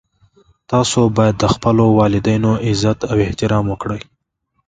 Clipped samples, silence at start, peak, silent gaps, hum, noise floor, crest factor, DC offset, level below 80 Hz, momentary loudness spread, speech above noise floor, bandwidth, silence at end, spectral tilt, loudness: under 0.1%; 0.7 s; 0 dBFS; none; none; -69 dBFS; 16 dB; under 0.1%; -38 dBFS; 8 LU; 54 dB; 9.4 kHz; 0.65 s; -6 dB/octave; -15 LUFS